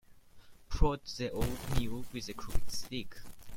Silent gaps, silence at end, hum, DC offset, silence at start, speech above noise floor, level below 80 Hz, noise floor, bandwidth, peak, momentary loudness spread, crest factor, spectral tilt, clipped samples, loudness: none; 0 s; none; under 0.1%; 0.1 s; 22 dB; -40 dBFS; -54 dBFS; 16.5 kHz; -10 dBFS; 10 LU; 22 dB; -5 dB/octave; under 0.1%; -38 LUFS